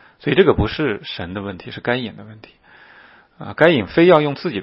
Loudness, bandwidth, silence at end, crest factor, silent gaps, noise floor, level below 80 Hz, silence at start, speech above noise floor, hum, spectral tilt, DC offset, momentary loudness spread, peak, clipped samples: -17 LUFS; 5.8 kHz; 0 s; 18 dB; none; -47 dBFS; -40 dBFS; 0.25 s; 30 dB; none; -8.5 dB/octave; under 0.1%; 17 LU; 0 dBFS; under 0.1%